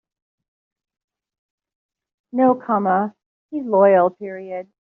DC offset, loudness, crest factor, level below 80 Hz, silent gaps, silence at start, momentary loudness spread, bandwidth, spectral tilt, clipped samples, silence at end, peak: under 0.1%; -18 LUFS; 18 dB; -72 dBFS; 3.26-3.49 s; 2.35 s; 17 LU; 3.4 kHz; -7.5 dB/octave; under 0.1%; 0.3 s; -4 dBFS